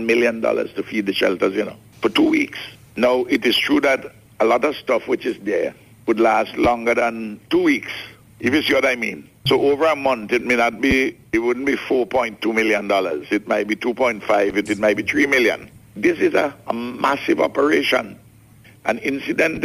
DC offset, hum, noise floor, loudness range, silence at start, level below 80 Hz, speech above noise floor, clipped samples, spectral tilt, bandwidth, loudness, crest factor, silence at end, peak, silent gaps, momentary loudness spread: under 0.1%; none; -48 dBFS; 1 LU; 0 s; -48 dBFS; 29 dB; under 0.1%; -4.5 dB/octave; 15 kHz; -19 LUFS; 14 dB; 0 s; -4 dBFS; none; 8 LU